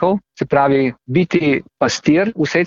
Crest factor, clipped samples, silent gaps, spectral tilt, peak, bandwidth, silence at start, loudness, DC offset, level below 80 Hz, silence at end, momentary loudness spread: 14 dB; under 0.1%; none; -6 dB/octave; -2 dBFS; 7.8 kHz; 0 s; -16 LUFS; under 0.1%; -50 dBFS; 0 s; 4 LU